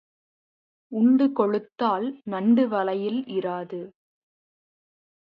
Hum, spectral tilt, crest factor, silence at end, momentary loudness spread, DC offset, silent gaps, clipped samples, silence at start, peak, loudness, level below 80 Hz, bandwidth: none; -9.5 dB/octave; 18 dB; 1.35 s; 14 LU; under 0.1%; none; under 0.1%; 0.9 s; -8 dBFS; -24 LUFS; -76 dBFS; 5.2 kHz